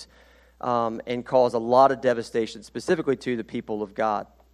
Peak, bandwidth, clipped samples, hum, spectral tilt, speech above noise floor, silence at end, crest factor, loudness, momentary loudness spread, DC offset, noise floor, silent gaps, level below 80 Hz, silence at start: -4 dBFS; 12.5 kHz; under 0.1%; none; -6 dB/octave; 31 dB; 0.3 s; 20 dB; -25 LUFS; 13 LU; under 0.1%; -55 dBFS; none; -60 dBFS; 0 s